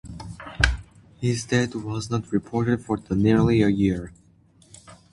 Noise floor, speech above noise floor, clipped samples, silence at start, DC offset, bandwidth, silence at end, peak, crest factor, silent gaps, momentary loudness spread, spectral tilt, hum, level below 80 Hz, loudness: -56 dBFS; 34 dB; under 0.1%; 0.05 s; under 0.1%; 11.5 kHz; 0.2 s; -2 dBFS; 24 dB; none; 17 LU; -6 dB/octave; none; -38 dBFS; -23 LUFS